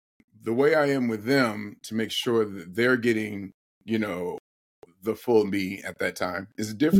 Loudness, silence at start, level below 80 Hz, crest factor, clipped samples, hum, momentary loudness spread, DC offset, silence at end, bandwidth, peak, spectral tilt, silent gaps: -26 LUFS; 0.45 s; -68 dBFS; 18 dB; under 0.1%; none; 13 LU; under 0.1%; 0 s; 17 kHz; -8 dBFS; -5.5 dB/octave; 3.54-3.81 s, 4.40-4.82 s